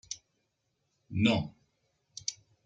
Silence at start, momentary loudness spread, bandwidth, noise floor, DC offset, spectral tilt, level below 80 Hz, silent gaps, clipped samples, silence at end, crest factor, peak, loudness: 0.1 s; 16 LU; 9.2 kHz; -79 dBFS; under 0.1%; -4.5 dB/octave; -64 dBFS; none; under 0.1%; 0.35 s; 24 dB; -12 dBFS; -32 LUFS